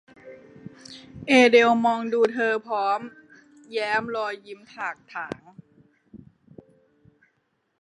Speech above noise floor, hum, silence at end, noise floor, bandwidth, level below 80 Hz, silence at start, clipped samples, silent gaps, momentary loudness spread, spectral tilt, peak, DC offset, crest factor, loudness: 49 dB; none; 1.65 s; -72 dBFS; 10.5 kHz; -68 dBFS; 0.25 s; under 0.1%; none; 26 LU; -4 dB/octave; -4 dBFS; under 0.1%; 22 dB; -22 LUFS